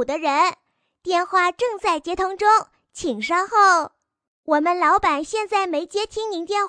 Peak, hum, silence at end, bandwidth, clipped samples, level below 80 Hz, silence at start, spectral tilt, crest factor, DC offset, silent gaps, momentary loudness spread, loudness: -6 dBFS; none; 0 s; 10.5 kHz; under 0.1%; -54 dBFS; 0 s; -2.5 dB/octave; 16 dB; under 0.1%; 4.27-4.43 s; 11 LU; -20 LUFS